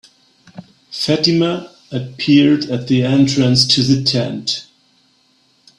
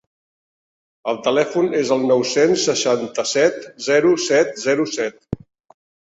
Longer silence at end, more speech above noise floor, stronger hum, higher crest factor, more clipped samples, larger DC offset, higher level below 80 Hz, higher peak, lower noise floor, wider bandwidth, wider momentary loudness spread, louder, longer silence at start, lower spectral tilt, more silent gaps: first, 1.15 s vs 0.8 s; second, 42 dB vs over 72 dB; neither; about the same, 16 dB vs 16 dB; neither; neither; about the same, -52 dBFS vs -56 dBFS; first, 0 dBFS vs -4 dBFS; second, -57 dBFS vs under -90 dBFS; first, 11.5 kHz vs 8 kHz; first, 14 LU vs 11 LU; first, -15 LUFS vs -18 LUFS; second, 0.55 s vs 1.05 s; first, -5 dB/octave vs -3.5 dB/octave; neither